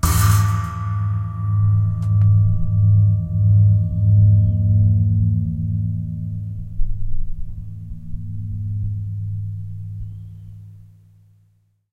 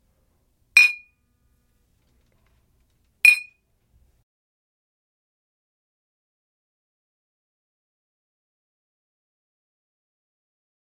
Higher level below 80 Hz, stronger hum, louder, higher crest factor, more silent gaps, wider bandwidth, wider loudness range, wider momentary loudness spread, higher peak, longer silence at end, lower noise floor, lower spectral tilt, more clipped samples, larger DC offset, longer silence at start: first, -28 dBFS vs -72 dBFS; neither; second, -19 LUFS vs -16 LUFS; second, 14 dB vs 28 dB; neither; about the same, 16 kHz vs 16.5 kHz; first, 13 LU vs 3 LU; first, 19 LU vs 8 LU; second, -4 dBFS vs 0 dBFS; second, 1.15 s vs 7.5 s; second, -60 dBFS vs -66 dBFS; first, -6.5 dB/octave vs 3.5 dB/octave; neither; neither; second, 0.05 s vs 0.75 s